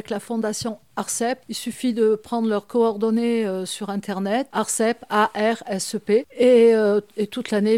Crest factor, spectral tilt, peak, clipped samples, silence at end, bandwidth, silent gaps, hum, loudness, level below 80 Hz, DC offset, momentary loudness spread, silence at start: 16 dB; -4.5 dB/octave; -6 dBFS; under 0.1%; 0 s; 16 kHz; none; none; -22 LUFS; -66 dBFS; 0.1%; 11 LU; 0.1 s